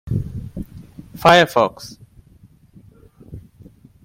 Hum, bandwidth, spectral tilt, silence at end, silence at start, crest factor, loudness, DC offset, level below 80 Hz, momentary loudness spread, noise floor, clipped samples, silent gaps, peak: none; 16.5 kHz; -5 dB/octave; 0.65 s; 0.05 s; 20 dB; -16 LUFS; under 0.1%; -44 dBFS; 28 LU; -50 dBFS; under 0.1%; none; 0 dBFS